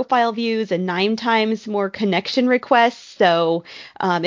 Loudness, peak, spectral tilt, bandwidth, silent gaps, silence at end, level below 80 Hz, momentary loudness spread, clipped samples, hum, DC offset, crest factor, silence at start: -19 LUFS; -2 dBFS; -5.5 dB/octave; 7.6 kHz; none; 0 s; -66 dBFS; 7 LU; under 0.1%; none; under 0.1%; 18 dB; 0 s